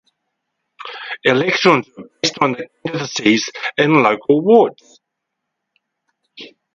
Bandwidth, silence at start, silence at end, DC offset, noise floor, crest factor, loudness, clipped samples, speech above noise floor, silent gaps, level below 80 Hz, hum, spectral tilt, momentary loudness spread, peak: 7.8 kHz; 0.8 s; 0.3 s; under 0.1%; -78 dBFS; 18 dB; -15 LUFS; under 0.1%; 62 dB; none; -64 dBFS; none; -4.5 dB/octave; 19 LU; 0 dBFS